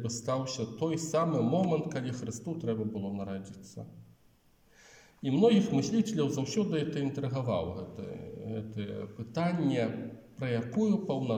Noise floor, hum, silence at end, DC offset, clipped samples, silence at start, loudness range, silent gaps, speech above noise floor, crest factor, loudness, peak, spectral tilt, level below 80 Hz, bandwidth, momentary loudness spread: -65 dBFS; none; 0 s; under 0.1%; under 0.1%; 0 s; 6 LU; none; 34 dB; 18 dB; -32 LUFS; -14 dBFS; -6.5 dB/octave; -68 dBFS; 15.5 kHz; 14 LU